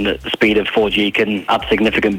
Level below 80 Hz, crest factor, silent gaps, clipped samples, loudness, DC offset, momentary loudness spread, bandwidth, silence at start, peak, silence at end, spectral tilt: -38 dBFS; 12 dB; none; under 0.1%; -15 LUFS; under 0.1%; 3 LU; 17 kHz; 0 s; -4 dBFS; 0 s; -5.5 dB/octave